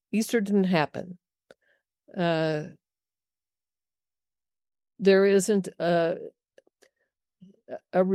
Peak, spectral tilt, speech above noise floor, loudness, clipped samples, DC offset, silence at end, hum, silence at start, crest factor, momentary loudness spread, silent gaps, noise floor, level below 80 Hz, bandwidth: -8 dBFS; -5.5 dB/octave; over 66 dB; -25 LUFS; under 0.1%; under 0.1%; 0 s; none; 0.15 s; 20 dB; 22 LU; none; under -90 dBFS; -74 dBFS; 14 kHz